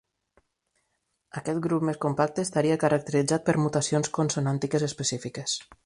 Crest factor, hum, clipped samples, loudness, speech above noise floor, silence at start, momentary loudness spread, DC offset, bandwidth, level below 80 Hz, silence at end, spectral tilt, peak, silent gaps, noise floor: 20 dB; none; under 0.1%; -26 LUFS; 51 dB; 1.35 s; 7 LU; under 0.1%; 11.5 kHz; -62 dBFS; 0.1 s; -5 dB/octave; -8 dBFS; none; -77 dBFS